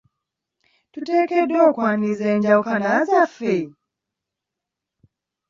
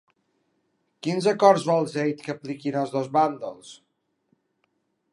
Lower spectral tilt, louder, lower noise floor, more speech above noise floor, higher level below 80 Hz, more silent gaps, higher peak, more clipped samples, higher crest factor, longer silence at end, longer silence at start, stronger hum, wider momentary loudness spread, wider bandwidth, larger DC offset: about the same, -7 dB/octave vs -6 dB/octave; first, -19 LUFS vs -24 LUFS; first, -84 dBFS vs -73 dBFS; first, 66 dB vs 50 dB; first, -68 dBFS vs -80 dBFS; neither; about the same, -4 dBFS vs -2 dBFS; neither; second, 18 dB vs 24 dB; first, 1.8 s vs 1.4 s; about the same, 0.95 s vs 1.05 s; neither; second, 8 LU vs 15 LU; second, 7.4 kHz vs 11.5 kHz; neither